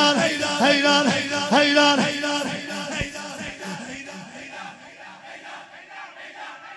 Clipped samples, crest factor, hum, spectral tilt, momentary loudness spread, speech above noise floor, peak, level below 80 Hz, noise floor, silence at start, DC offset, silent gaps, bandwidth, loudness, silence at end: under 0.1%; 18 dB; none; -3 dB/octave; 22 LU; 25 dB; -4 dBFS; -54 dBFS; -43 dBFS; 0 s; under 0.1%; none; 11 kHz; -20 LUFS; 0 s